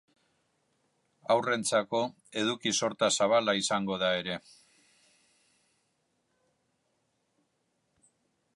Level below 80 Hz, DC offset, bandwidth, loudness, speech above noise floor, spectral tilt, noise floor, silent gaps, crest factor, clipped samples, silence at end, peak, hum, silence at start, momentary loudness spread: -74 dBFS; under 0.1%; 11.5 kHz; -29 LUFS; 48 dB; -3 dB/octave; -77 dBFS; none; 20 dB; under 0.1%; 4.15 s; -12 dBFS; none; 1.3 s; 9 LU